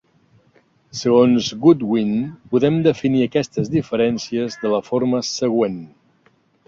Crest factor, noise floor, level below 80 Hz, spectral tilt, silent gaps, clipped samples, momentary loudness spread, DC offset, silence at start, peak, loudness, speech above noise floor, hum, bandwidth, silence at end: 18 dB; -59 dBFS; -56 dBFS; -6 dB/octave; none; under 0.1%; 8 LU; under 0.1%; 0.95 s; -2 dBFS; -19 LUFS; 41 dB; none; 7.6 kHz; 0.8 s